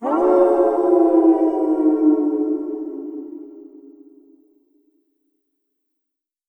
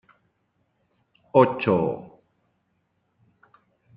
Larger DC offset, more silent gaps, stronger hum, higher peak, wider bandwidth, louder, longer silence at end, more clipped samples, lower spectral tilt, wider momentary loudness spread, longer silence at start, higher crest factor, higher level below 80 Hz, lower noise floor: neither; neither; neither; about the same, -2 dBFS vs -2 dBFS; second, 3.1 kHz vs 5 kHz; first, -17 LUFS vs -22 LUFS; first, 2.7 s vs 1.9 s; neither; second, -7.5 dB/octave vs -10 dB/octave; first, 17 LU vs 11 LU; second, 0 s vs 1.35 s; second, 16 dB vs 24 dB; about the same, -62 dBFS vs -66 dBFS; first, -82 dBFS vs -72 dBFS